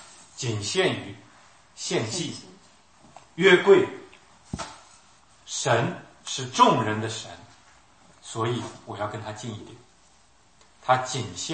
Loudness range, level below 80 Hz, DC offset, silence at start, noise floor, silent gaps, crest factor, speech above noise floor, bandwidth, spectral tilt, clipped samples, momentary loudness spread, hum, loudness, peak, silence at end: 11 LU; -62 dBFS; under 0.1%; 0 s; -60 dBFS; none; 22 dB; 35 dB; 8.8 kHz; -4 dB/octave; under 0.1%; 22 LU; none; -25 LUFS; -4 dBFS; 0 s